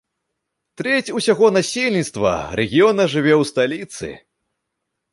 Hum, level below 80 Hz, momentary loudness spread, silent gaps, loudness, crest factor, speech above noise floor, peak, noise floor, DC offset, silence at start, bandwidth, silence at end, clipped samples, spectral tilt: none; -50 dBFS; 13 LU; none; -17 LUFS; 16 dB; 60 dB; -2 dBFS; -78 dBFS; under 0.1%; 0.8 s; 11.5 kHz; 0.95 s; under 0.1%; -4.5 dB/octave